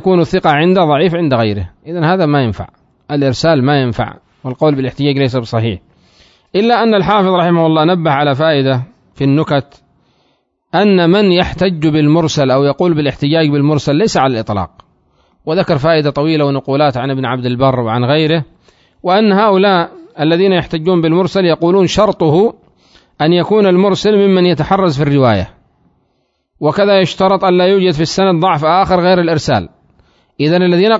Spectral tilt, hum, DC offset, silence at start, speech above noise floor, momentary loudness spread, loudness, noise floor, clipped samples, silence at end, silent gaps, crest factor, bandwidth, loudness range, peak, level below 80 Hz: -6.5 dB/octave; none; under 0.1%; 0 s; 52 dB; 8 LU; -12 LUFS; -63 dBFS; under 0.1%; 0 s; none; 12 dB; 7.8 kHz; 3 LU; 0 dBFS; -42 dBFS